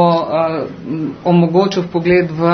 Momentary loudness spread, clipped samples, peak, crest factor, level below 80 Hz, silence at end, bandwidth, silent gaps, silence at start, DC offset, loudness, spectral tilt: 10 LU; under 0.1%; 0 dBFS; 14 dB; -48 dBFS; 0 s; 6.4 kHz; none; 0 s; under 0.1%; -15 LUFS; -8 dB/octave